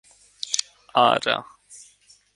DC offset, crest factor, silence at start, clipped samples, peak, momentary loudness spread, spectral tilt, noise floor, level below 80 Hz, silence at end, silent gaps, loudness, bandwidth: under 0.1%; 24 dB; 0.45 s; under 0.1%; -2 dBFS; 9 LU; -1.5 dB/octave; -56 dBFS; -68 dBFS; 0.6 s; none; -22 LUFS; 11.5 kHz